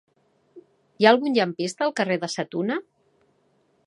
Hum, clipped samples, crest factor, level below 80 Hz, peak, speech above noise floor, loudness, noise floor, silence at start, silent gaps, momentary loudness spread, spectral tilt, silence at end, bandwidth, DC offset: none; under 0.1%; 24 dB; -78 dBFS; -2 dBFS; 43 dB; -23 LUFS; -65 dBFS; 0.55 s; none; 10 LU; -4.5 dB/octave; 1.05 s; 11.5 kHz; under 0.1%